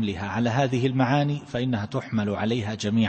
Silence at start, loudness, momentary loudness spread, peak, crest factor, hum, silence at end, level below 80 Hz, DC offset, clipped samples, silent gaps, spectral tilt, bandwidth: 0 s; -25 LUFS; 5 LU; -10 dBFS; 16 dB; none; 0 s; -56 dBFS; under 0.1%; under 0.1%; none; -6.5 dB/octave; 8.6 kHz